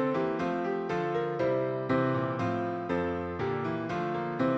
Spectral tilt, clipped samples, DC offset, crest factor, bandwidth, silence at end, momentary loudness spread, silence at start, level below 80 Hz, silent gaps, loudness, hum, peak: -8 dB/octave; under 0.1%; under 0.1%; 14 dB; 8 kHz; 0 s; 4 LU; 0 s; -60 dBFS; none; -31 LUFS; none; -16 dBFS